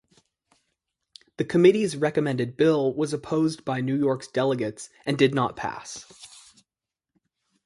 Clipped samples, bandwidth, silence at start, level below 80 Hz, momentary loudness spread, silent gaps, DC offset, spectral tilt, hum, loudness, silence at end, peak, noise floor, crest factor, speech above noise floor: under 0.1%; 11.5 kHz; 1.4 s; -64 dBFS; 18 LU; none; under 0.1%; -6 dB/octave; none; -24 LUFS; 1.4 s; -6 dBFS; -89 dBFS; 20 dB; 65 dB